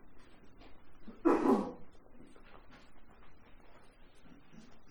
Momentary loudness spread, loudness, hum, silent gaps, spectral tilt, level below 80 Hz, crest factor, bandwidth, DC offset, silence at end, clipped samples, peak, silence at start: 29 LU; -32 LUFS; none; none; -7 dB/octave; -60 dBFS; 22 dB; 12.5 kHz; under 0.1%; 0 s; under 0.1%; -16 dBFS; 0 s